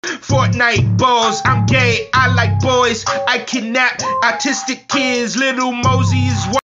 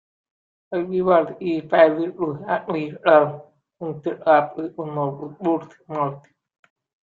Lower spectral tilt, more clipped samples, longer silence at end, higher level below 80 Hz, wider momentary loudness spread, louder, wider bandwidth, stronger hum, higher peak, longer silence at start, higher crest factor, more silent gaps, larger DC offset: second, -4.5 dB/octave vs -9 dB/octave; neither; second, 0.1 s vs 0.85 s; first, -40 dBFS vs -68 dBFS; second, 5 LU vs 13 LU; first, -14 LUFS vs -21 LUFS; first, 7.8 kHz vs 4.6 kHz; neither; about the same, 0 dBFS vs -2 dBFS; second, 0.05 s vs 0.7 s; second, 14 dB vs 20 dB; neither; neither